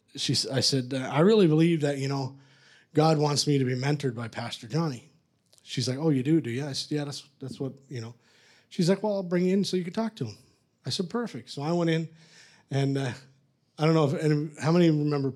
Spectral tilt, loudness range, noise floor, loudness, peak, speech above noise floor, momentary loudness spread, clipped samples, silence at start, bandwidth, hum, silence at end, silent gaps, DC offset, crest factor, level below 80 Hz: -6 dB/octave; 6 LU; -64 dBFS; -27 LUFS; -10 dBFS; 38 dB; 15 LU; under 0.1%; 0.15 s; 13.5 kHz; none; 0 s; none; under 0.1%; 18 dB; -76 dBFS